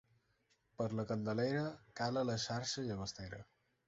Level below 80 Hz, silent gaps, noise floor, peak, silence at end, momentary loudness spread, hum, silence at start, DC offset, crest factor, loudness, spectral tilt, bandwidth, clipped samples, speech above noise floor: -68 dBFS; none; -78 dBFS; -24 dBFS; 0.45 s; 9 LU; none; 0.8 s; under 0.1%; 16 dB; -40 LUFS; -5 dB/octave; 7.6 kHz; under 0.1%; 39 dB